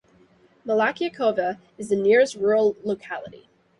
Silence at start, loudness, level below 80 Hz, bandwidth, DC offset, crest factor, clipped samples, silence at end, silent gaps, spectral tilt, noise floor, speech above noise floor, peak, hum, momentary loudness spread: 0.65 s; -22 LUFS; -66 dBFS; 11.5 kHz; under 0.1%; 16 dB; under 0.1%; 0.5 s; none; -5 dB/octave; -57 dBFS; 35 dB; -6 dBFS; none; 16 LU